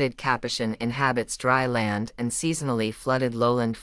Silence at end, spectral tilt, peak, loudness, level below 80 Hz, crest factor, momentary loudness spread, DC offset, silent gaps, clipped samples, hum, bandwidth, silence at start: 0 s; -4.5 dB/octave; -6 dBFS; -25 LUFS; -54 dBFS; 18 dB; 5 LU; under 0.1%; none; under 0.1%; none; 12 kHz; 0 s